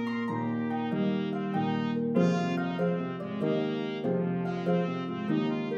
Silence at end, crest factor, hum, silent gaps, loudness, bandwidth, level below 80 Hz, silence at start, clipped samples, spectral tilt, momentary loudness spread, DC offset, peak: 0 s; 16 dB; none; none; -30 LUFS; 7.4 kHz; -74 dBFS; 0 s; under 0.1%; -8 dB/octave; 5 LU; under 0.1%; -12 dBFS